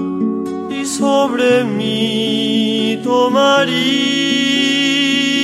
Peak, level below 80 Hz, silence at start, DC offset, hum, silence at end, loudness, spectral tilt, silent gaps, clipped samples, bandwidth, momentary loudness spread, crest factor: -2 dBFS; -62 dBFS; 0 s; under 0.1%; none; 0 s; -14 LUFS; -3.5 dB/octave; none; under 0.1%; 13.5 kHz; 7 LU; 14 dB